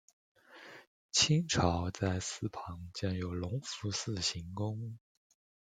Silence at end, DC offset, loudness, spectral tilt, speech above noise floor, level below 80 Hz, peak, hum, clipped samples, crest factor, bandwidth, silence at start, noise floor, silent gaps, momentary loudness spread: 0.8 s; under 0.1%; -34 LUFS; -4 dB/octave; 20 dB; -60 dBFS; -12 dBFS; none; under 0.1%; 24 dB; 9.6 kHz; 0.5 s; -55 dBFS; 0.87-1.09 s; 21 LU